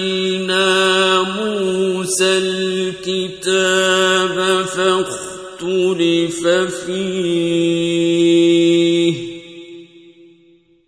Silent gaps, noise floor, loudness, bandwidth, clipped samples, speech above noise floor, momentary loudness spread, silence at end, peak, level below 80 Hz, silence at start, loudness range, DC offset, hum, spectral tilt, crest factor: none; -52 dBFS; -16 LUFS; 11 kHz; under 0.1%; 35 dB; 9 LU; 1.05 s; -2 dBFS; -56 dBFS; 0 s; 2 LU; under 0.1%; none; -4 dB/octave; 14 dB